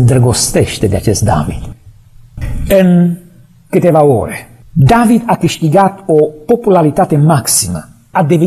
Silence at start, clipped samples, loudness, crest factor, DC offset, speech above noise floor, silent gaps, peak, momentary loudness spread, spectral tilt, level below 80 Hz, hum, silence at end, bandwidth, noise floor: 0 s; under 0.1%; -10 LUFS; 10 dB; under 0.1%; 28 dB; none; 0 dBFS; 14 LU; -6 dB/octave; -30 dBFS; none; 0 s; 14.5 kHz; -38 dBFS